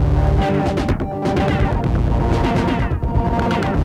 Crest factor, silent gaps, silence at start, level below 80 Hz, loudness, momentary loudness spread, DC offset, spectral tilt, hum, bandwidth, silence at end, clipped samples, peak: 12 dB; none; 0 s; -22 dBFS; -19 LUFS; 3 LU; under 0.1%; -8 dB/octave; none; 10.5 kHz; 0 s; under 0.1%; -4 dBFS